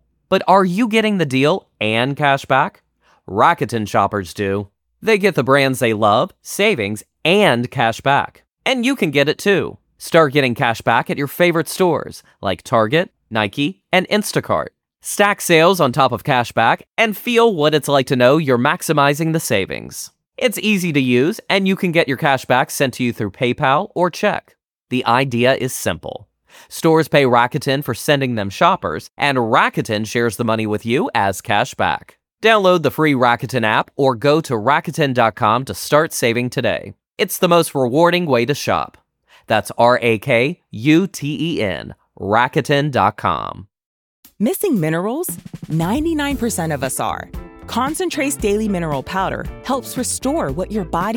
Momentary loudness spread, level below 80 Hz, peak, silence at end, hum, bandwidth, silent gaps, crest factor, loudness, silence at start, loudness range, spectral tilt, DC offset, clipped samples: 9 LU; -46 dBFS; 0 dBFS; 0 s; none; 20 kHz; 43.86-44.23 s; 16 dB; -17 LUFS; 0.3 s; 5 LU; -5 dB/octave; under 0.1%; under 0.1%